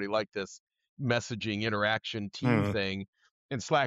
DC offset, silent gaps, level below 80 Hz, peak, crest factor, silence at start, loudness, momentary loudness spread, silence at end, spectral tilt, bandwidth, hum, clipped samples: under 0.1%; 0.60-0.67 s, 0.89-0.97 s, 3.08-3.13 s, 3.31-3.49 s; -64 dBFS; -14 dBFS; 18 dB; 0 s; -31 LUFS; 12 LU; 0 s; -5.5 dB/octave; 10.5 kHz; none; under 0.1%